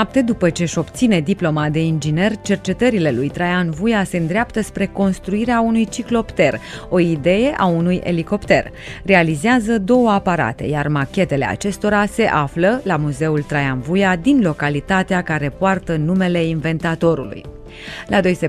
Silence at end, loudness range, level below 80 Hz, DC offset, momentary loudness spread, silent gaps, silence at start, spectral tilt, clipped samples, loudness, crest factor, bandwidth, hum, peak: 0 s; 2 LU; -40 dBFS; under 0.1%; 5 LU; none; 0 s; -6.5 dB/octave; under 0.1%; -17 LUFS; 18 dB; 13.5 kHz; none; 0 dBFS